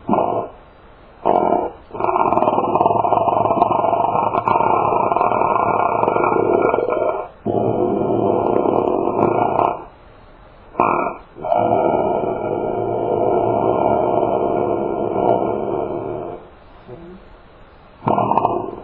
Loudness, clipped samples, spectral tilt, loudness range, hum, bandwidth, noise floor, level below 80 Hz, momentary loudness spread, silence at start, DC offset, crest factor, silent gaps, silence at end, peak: -18 LUFS; under 0.1%; -11 dB/octave; 5 LU; none; 4.3 kHz; -44 dBFS; -48 dBFS; 9 LU; 0 s; under 0.1%; 18 dB; none; 0 s; 0 dBFS